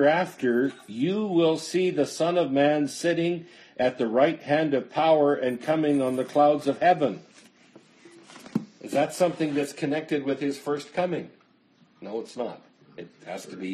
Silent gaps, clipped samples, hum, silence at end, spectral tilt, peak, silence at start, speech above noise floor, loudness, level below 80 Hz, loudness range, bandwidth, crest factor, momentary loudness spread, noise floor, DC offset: none; under 0.1%; none; 0 s; -5.5 dB/octave; -8 dBFS; 0 s; 36 dB; -25 LUFS; -72 dBFS; 7 LU; 13 kHz; 18 dB; 14 LU; -61 dBFS; under 0.1%